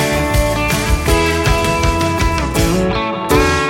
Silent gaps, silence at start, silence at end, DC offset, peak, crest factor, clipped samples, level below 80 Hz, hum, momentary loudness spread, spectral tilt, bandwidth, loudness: none; 0 s; 0 s; under 0.1%; -2 dBFS; 12 dB; under 0.1%; -22 dBFS; none; 2 LU; -4.5 dB/octave; 17 kHz; -15 LUFS